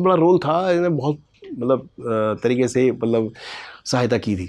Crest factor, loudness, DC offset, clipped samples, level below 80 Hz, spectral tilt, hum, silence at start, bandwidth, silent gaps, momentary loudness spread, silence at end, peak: 16 dB; -20 LUFS; under 0.1%; under 0.1%; -58 dBFS; -6.5 dB/octave; none; 0 s; 11 kHz; none; 15 LU; 0 s; -4 dBFS